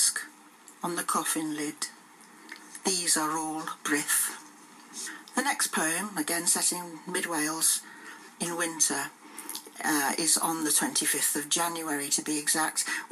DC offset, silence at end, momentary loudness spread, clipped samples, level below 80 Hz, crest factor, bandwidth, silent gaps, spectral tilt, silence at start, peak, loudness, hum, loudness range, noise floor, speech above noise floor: under 0.1%; 0.05 s; 14 LU; under 0.1%; under -90 dBFS; 20 dB; 15.5 kHz; none; -1 dB/octave; 0 s; -10 dBFS; -27 LUFS; none; 4 LU; -53 dBFS; 24 dB